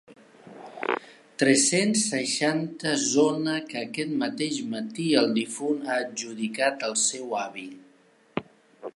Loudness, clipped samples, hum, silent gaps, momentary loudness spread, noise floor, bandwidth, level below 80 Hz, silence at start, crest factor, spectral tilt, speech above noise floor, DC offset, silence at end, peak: -26 LUFS; under 0.1%; none; none; 14 LU; -59 dBFS; 11.5 kHz; -74 dBFS; 0.1 s; 20 dB; -3 dB/octave; 33 dB; under 0.1%; 0.05 s; -6 dBFS